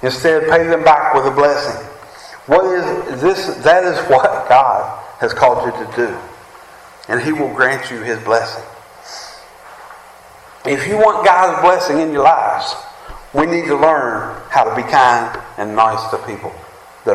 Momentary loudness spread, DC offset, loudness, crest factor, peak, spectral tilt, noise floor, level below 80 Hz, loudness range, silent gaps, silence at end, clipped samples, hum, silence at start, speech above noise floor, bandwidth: 17 LU; under 0.1%; -14 LUFS; 14 dB; 0 dBFS; -4.5 dB/octave; -40 dBFS; -48 dBFS; 6 LU; none; 0 s; under 0.1%; none; 0 s; 26 dB; 13.5 kHz